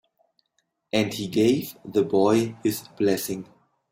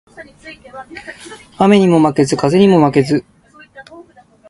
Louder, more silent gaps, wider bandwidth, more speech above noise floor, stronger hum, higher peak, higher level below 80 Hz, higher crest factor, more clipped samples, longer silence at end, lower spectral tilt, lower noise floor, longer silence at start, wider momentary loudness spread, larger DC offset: second, -24 LUFS vs -12 LUFS; neither; first, 16.5 kHz vs 11.5 kHz; first, 51 dB vs 29 dB; neither; second, -8 dBFS vs 0 dBFS; second, -62 dBFS vs -50 dBFS; about the same, 16 dB vs 14 dB; neither; about the same, 0.5 s vs 0.5 s; about the same, -5.5 dB/octave vs -6.5 dB/octave; first, -74 dBFS vs -43 dBFS; first, 0.95 s vs 0.2 s; second, 7 LU vs 24 LU; neither